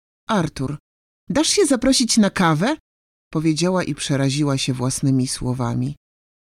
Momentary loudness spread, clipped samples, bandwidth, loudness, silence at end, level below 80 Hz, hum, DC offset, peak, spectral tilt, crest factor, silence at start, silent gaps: 11 LU; under 0.1%; 15.5 kHz; -20 LUFS; 0.55 s; -46 dBFS; none; under 0.1%; -6 dBFS; -4.5 dB/octave; 14 dB; 0.3 s; 0.80-1.27 s, 2.80-3.31 s